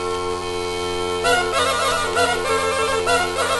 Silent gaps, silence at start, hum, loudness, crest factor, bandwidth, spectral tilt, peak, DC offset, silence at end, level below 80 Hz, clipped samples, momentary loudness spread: none; 0 s; none; -20 LUFS; 16 dB; 12 kHz; -2.5 dB/octave; -4 dBFS; under 0.1%; 0 s; -42 dBFS; under 0.1%; 6 LU